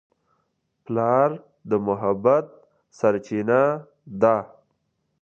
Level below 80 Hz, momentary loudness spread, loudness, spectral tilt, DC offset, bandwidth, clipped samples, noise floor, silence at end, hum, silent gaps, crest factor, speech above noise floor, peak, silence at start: -64 dBFS; 15 LU; -22 LUFS; -8.5 dB/octave; under 0.1%; 7.4 kHz; under 0.1%; -73 dBFS; 0.75 s; none; none; 20 dB; 52 dB; -4 dBFS; 0.9 s